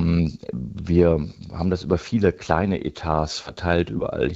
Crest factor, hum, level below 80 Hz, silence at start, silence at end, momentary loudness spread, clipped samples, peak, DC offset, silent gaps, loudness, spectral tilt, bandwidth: 20 dB; none; -40 dBFS; 0 s; 0 s; 10 LU; under 0.1%; -2 dBFS; under 0.1%; none; -23 LUFS; -7 dB/octave; 8 kHz